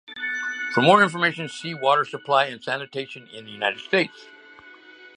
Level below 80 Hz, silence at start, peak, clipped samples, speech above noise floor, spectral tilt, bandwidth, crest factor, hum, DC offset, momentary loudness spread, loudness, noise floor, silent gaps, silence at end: -74 dBFS; 0.1 s; -2 dBFS; under 0.1%; 25 dB; -4.5 dB/octave; 10.5 kHz; 22 dB; none; under 0.1%; 15 LU; -22 LUFS; -47 dBFS; none; 0.1 s